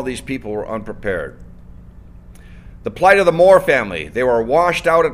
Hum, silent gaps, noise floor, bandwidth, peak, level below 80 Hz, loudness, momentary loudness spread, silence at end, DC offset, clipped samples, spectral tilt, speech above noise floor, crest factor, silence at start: none; none; -39 dBFS; 15.5 kHz; 0 dBFS; -40 dBFS; -15 LUFS; 15 LU; 0 s; under 0.1%; under 0.1%; -5 dB/octave; 24 dB; 16 dB; 0 s